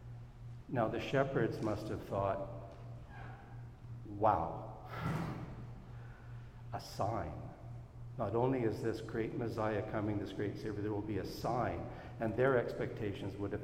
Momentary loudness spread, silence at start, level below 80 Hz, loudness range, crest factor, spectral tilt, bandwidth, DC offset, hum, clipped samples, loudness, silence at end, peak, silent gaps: 17 LU; 0 s; -56 dBFS; 5 LU; 22 dB; -7.5 dB/octave; 16 kHz; under 0.1%; none; under 0.1%; -38 LUFS; 0 s; -16 dBFS; none